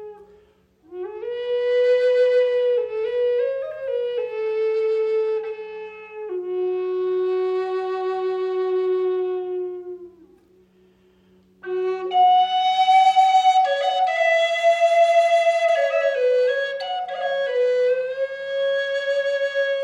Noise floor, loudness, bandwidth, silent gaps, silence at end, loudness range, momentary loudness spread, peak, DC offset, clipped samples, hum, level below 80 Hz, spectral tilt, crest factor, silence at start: -57 dBFS; -21 LUFS; 10.5 kHz; none; 0 s; 8 LU; 14 LU; -6 dBFS; under 0.1%; under 0.1%; none; -70 dBFS; -2.5 dB/octave; 14 dB; 0 s